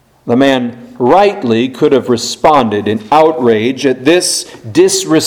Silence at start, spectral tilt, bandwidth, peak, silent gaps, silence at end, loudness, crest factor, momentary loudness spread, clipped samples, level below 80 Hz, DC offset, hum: 0.25 s; -4 dB/octave; 18 kHz; 0 dBFS; none; 0 s; -11 LUFS; 10 dB; 7 LU; 0.5%; -48 dBFS; under 0.1%; none